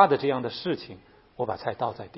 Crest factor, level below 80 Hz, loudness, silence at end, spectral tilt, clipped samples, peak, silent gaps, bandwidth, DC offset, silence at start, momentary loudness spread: 24 dB; -64 dBFS; -28 LUFS; 0 s; -9.5 dB/octave; under 0.1%; -4 dBFS; none; 5.8 kHz; under 0.1%; 0 s; 14 LU